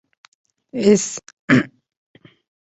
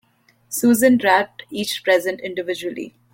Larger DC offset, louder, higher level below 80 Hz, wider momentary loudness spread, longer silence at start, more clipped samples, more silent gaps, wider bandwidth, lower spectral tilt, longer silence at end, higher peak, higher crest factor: neither; about the same, -18 LUFS vs -19 LUFS; about the same, -60 dBFS vs -62 dBFS; about the same, 16 LU vs 14 LU; first, 0.75 s vs 0.5 s; neither; first, 1.33-1.48 s vs none; second, 8.2 kHz vs 16.5 kHz; first, -5 dB/octave vs -3.5 dB/octave; first, 1.05 s vs 0.25 s; about the same, -2 dBFS vs -2 dBFS; about the same, 20 dB vs 18 dB